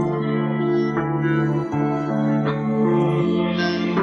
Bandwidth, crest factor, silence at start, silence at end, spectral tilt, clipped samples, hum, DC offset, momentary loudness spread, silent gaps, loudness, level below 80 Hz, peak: 7 kHz; 14 dB; 0 s; 0 s; -8.5 dB/octave; under 0.1%; none; under 0.1%; 3 LU; none; -21 LUFS; -54 dBFS; -8 dBFS